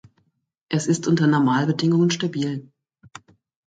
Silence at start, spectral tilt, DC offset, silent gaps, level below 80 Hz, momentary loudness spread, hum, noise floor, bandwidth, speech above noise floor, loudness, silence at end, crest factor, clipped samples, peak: 0.7 s; -6 dB/octave; under 0.1%; none; -64 dBFS; 9 LU; none; -68 dBFS; 9.2 kHz; 48 dB; -21 LUFS; 1.05 s; 16 dB; under 0.1%; -8 dBFS